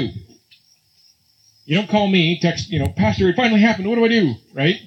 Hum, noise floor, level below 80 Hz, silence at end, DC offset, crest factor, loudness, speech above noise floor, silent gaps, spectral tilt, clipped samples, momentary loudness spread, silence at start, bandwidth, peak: none; -57 dBFS; -44 dBFS; 0.05 s; under 0.1%; 16 dB; -17 LUFS; 40 dB; none; -6 dB/octave; under 0.1%; 7 LU; 0 s; 8.4 kHz; -2 dBFS